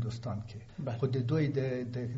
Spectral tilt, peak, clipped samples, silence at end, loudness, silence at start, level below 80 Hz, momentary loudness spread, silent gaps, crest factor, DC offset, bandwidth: -8 dB/octave; -20 dBFS; under 0.1%; 0 s; -34 LUFS; 0 s; -60 dBFS; 11 LU; none; 14 dB; under 0.1%; 7.6 kHz